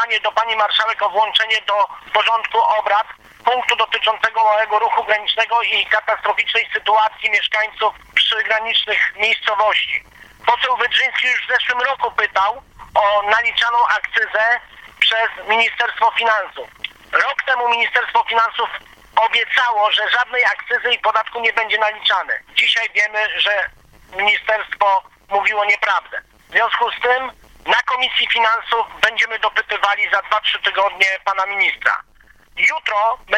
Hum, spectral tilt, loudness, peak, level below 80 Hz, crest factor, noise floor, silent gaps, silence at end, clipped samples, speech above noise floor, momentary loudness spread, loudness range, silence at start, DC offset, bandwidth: none; 0 dB/octave; -16 LUFS; 0 dBFS; -56 dBFS; 18 dB; -49 dBFS; none; 0 s; under 0.1%; 31 dB; 5 LU; 1 LU; 0 s; under 0.1%; 15 kHz